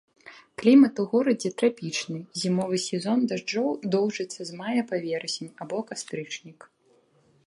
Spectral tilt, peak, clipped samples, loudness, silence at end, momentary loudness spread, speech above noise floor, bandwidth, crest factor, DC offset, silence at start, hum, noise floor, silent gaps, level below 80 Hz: -5 dB/octave; -8 dBFS; under 0.1%; -26 LUFS; 0.95 s; 15 LU; 38 dB; 11.5 kHz; 18 dB; under 0.1%; 0.25 s; none; -63 dBFS; none; -74 dBFS